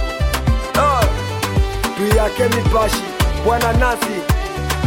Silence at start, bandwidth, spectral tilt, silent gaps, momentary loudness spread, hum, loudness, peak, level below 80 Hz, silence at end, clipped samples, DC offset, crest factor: 0 s; 17 kHz; -5 dB/octave; none; 5 LU; none; -17 LUFS; -2 dBFS; -22 dBFS; 0 s; under 0.1%; under 0.1%; 14 dB